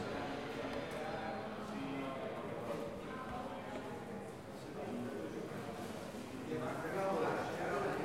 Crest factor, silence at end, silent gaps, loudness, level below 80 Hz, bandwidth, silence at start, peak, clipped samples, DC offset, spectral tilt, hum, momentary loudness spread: 16 dB; 0 s; none; -43 LUFS; -66 dBFS; 16 kHz; 0 s; -26 dBFS; under 0.1%; under 0.1%; -5.5 dB/octave; none; 8 LU